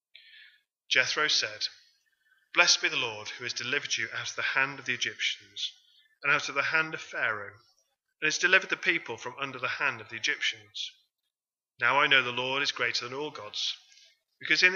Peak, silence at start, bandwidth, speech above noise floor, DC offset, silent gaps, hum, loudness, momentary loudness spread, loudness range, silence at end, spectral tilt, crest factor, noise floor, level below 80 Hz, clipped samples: -6 dBFS; 0.35 s; 7.6 kHz; over 61 dB; under 0.1%; none; none; -28 LUFS; 14 LU; 3 LU; 0 s; -1 dB/octave; 26 dB; under -90 dBFS; -86 dBFS; under 0.1%